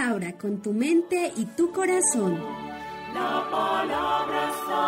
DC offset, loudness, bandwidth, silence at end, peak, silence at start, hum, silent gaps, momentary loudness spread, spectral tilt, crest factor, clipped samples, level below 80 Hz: under 0.1%; -26 LUFS; 16 kHz; 0 s; -12 dBFS; 0 s; none; none; 11 LU; -3.5 dB/octave; 14 dB; under 0.1%; -60 dBFS